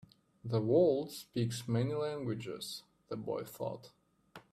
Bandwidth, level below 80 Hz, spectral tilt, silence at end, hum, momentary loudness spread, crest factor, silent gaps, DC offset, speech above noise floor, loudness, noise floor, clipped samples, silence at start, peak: 14.5 kHz; -72 dBFS; -6.5 dB/octave; 0.1 s; none; 16 LU; 18 dB; none; under 0.1%; 25 dB; -35 LUFS; -59 dBFS; under 0.1%; 0.45 s; -18 dBFS